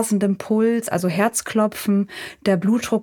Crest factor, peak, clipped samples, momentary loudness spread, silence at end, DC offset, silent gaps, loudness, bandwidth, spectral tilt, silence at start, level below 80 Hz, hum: 14 dB; -6 dBFS; under 0.1%; 3 LU; 0 s; under 0.1%; none; -20 LUFS; 19 kHz; -5.5 dB/octave; 0 s; -60 dBFS; none